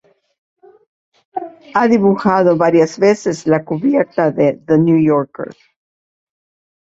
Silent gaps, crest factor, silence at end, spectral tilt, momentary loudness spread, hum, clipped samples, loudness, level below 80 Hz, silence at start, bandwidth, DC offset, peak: none; 16 dB; 1.35 s; -7.5 dB/octave; 16 LU; none; under 0.1%; -14 LUFS; -58 dBFS; 1.35 s; 7.8 kHz; under 0.1%; 0 dBFS